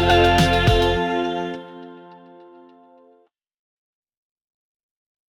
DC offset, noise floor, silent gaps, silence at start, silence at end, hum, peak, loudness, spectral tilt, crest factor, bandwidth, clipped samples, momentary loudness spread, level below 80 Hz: under 0.1%; -60 dBFS; none; 0 s; 3.15 s; none; -6 dBFS; -18 LUFS; -5.5 dB/octave; 18 dB; 18 kHz; under 0.1%; 24 LU; -34 dBFS